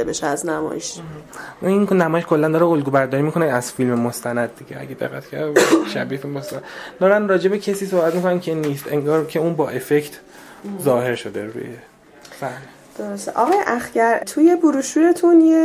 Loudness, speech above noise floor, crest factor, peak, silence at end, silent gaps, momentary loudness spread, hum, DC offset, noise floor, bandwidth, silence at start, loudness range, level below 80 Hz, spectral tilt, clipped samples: -19 LUFS; 24 dB; 18 dB; -2 dBFS; 0 s; none; 17 LU; none; under 0.1%; -43 dBFS; 15.5 kHz; 0 s; 5 LU; -60 dBFS; -5.5 dB/octave; under 0.1%